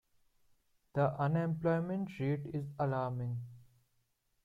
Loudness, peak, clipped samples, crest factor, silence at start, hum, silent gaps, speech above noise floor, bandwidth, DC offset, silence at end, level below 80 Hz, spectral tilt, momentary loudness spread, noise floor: -36 LUFS; -20 dBFS; under 0.1%; 16 dB; 0.95 s; none; none; 43 dB; 5 kHz; under 0.1%; 0.8 s; -70 dBFS; -9.5 dB/octave; 8 LU; -78 dBFS